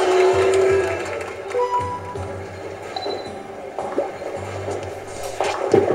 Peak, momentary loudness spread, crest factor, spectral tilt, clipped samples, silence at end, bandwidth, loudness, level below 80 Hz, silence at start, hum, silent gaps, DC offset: -2 dBFS; 15 LU; 20 dB; -5 dB/octave; under 0.1%; 0 s; 14.5 kHz; -23 LUFS; -52 dBFS; 0 s; none; none; under 0.1%